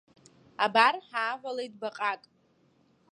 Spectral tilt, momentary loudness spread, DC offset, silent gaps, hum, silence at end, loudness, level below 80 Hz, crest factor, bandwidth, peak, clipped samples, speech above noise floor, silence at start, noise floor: -3 dB/octave; 15 LU; under 0.1%; none; none; 0.95 s; -28 LUFS; -84 dBFS; 24 dB; 11 kHz; -8 dBFS; under 0.1%; 38 dB; 0.6 s; -67 dBFS